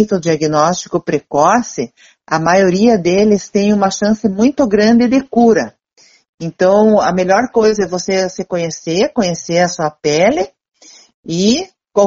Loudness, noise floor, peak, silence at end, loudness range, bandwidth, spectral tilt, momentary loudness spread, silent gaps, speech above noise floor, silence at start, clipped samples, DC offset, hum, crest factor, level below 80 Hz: -13 LUFS; -50 dBFS; 0 dBFS; 0 s; 4 LU; 7.8 kHz; -5 dB/octave; 9 LU; 6.29-6.38 s, 10.68-10.72 s, 11.14-11.23 s; 37 dB; 0 s; under 0.1%; under 0.1%; none; 14 dB; -48 dBFS